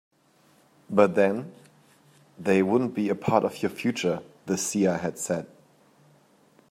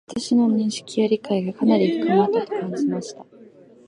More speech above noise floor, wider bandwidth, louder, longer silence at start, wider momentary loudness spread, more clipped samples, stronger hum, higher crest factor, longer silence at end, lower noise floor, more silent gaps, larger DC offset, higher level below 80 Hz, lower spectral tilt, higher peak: first, 37 dB vs 27 dB; first, 16 kHz vs 11 kHz; second, -26 LUFS vs -21 LUFS; first, 0.9 s vs 0.1 s; first, 11 LU vs 7 LU; neither; neither; first, 22 dB vs 16 dB; first, 1.25 s vs 0.45 s; first, -62 dBFS vs -48 dBFS; neither; neither; about the same, -70 dBFS vs -66 dBFS; about the same, -5.5 dB/octave vs -6 dB/octave; about the same, -6 dBFS vs -4 dBFS